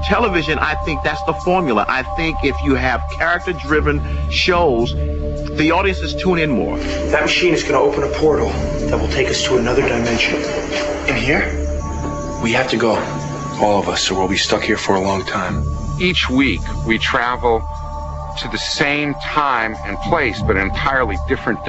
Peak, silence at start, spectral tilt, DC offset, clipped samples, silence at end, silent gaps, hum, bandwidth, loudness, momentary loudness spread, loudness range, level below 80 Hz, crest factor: -2 dBFS; 0 s; -5 dB/octave; under 0.1%; under 0.1%; 0 s; none; none; 8.2 kHz; -17 LUFS; 7 LU; 2 LU; -28 dBFS; 16 dB